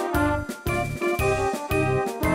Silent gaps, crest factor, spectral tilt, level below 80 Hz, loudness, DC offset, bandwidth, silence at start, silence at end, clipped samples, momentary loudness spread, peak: none; 14 dB; -6 dB/octave; -36 dBFS; -25 LUFS; under 0.1%; 16 kHz; 0 s; 0 s; under 0.1%; 4 LU; -10 dBFS